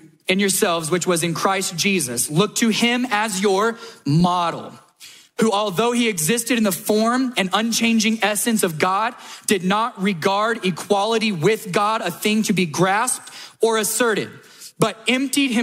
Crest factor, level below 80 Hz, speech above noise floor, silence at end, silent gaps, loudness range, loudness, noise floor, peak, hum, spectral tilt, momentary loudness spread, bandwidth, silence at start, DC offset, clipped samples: 18 dB; -60 dBFS; 26 dB; 0 s; none; 2 LU; -19 LUFS; -45 dBFS; -2 dBFS; none; -3.5 dB/octave; 5 LU; 16 kHz; 0.05 s; under 0.1%; under 0.1%